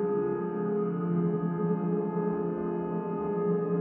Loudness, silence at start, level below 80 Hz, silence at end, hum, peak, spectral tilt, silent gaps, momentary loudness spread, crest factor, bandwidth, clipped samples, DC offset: -30 LUFS; 0 s; -66 dBFS; 0 s; none; -16 dBFS; -11 dB/octave; none; 3 LU; 12 dB; 3.1 kHz; under 0.1%; under 0.1%